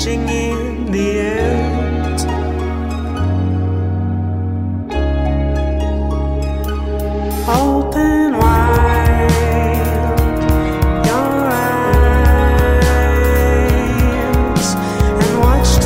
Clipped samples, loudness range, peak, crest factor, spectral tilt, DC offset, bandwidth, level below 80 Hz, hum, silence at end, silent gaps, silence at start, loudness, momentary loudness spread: under 0.1%; 5 LU; -2 dBFS; 12 dB; -6.5 dB/octave; under 0.1%; 16.5 kHz; -18 dBFS; none; 0 s; none; 0 s; -15 LUFS; 7 LU